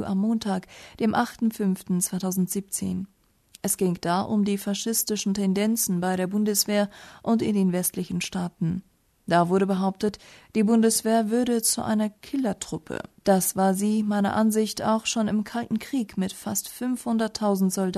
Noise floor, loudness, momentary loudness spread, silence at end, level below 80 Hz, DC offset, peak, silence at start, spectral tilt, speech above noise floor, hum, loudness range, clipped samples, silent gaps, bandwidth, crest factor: -56 dBFS; -25 LUFS; 8 LU; 0 s; -60 dBFS; under 0.1%; -8 dBFS; 0 s; -4.5 dB/octave; 31 dB; none; 3 LU; under 0.1%; none; 13.5 kHz; 18 dB